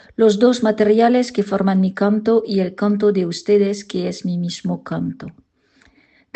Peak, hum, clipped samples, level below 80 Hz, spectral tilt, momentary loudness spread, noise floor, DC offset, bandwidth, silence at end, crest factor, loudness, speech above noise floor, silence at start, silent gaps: -2 dBFS; none; under 0.1%; -60 dBFS; -6.5 dB/octave; 11 LU; -56 dBFS; under 0.1%; 8.6 kHz; 1.05 s; 16 dB; -18 LUFS; 39 dB; 0.2 s; none